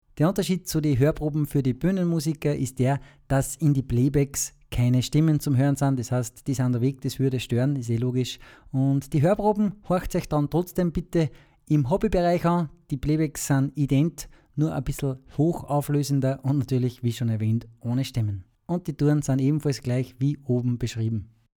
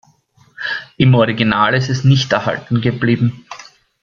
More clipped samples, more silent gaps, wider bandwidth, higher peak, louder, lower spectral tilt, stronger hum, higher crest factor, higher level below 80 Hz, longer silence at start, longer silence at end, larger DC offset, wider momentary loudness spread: neither; neither; first, 18.5 kHz vs 7.2 kHz; second, -8 dBFS vs 0 dBFS; second, -25 LUFS vs -15 LUFS; about the same, -7 dB/octave vs -6.5 dB/octave; neither; about the same, 16 dB vs 16 dB; first, -44 dBFS vs -50 dBFS; second, 0.15 s vs 0.6 s; about the same, 0.35 s vs 0.4 s; neither; second, 7 LU vs 13 LU